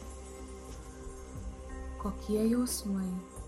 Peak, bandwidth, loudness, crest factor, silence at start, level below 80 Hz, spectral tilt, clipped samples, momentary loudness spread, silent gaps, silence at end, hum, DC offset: -20 dBFS; 14.5 kHz; -35 LUFS; 16 dB; 0 s; -46 dBFS; -5.5 dB/octave; under 0.1%; 17 LU; none; 0 s; none; under 0.1%